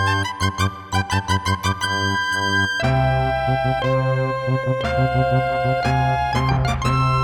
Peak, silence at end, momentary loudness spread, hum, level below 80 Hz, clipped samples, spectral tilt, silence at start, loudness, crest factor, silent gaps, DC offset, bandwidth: -6 dBFS; 0 s; 3 LU; none; -34 dBFS; under 0.1%; -5.5 dB/octave; 0 s; -20 LUFS; 12 dB; none; under 0.1%; 14 kHz